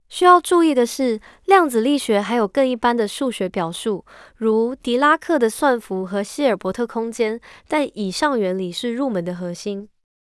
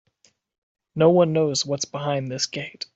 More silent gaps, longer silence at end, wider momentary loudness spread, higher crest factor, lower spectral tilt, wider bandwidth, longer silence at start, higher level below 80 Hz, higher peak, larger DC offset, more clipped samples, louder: neither; first, 0.45 s vs 0.1 s; about the same, 11 LU vs 10 LU; about the same, 18 dB vs 20 dB; about the same, -4.5 dB/octave vs -5 dB/octave; first, 12 kHz vs 8.2 kHz; second, 0.1 s vs 0.95 s; first, -58 dBFS vs -64 dBFS; first, 0 dBFS vs -4 dBFS; neither; neither; about the same, -20 LUFS vs -22 LUFS